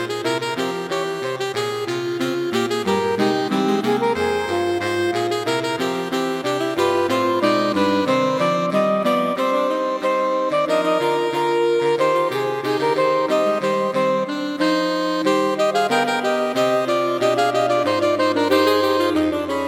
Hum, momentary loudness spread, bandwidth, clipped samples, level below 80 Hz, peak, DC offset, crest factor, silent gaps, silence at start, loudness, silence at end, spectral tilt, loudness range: none; 5 LU; 16.5 kHz; under 0.1%; -62 dBFS; -4 dBFS; under 0.1%; 14 dB; none; 0 s; -20 LUFS; 0 s; -5 dB/octave; 3 LU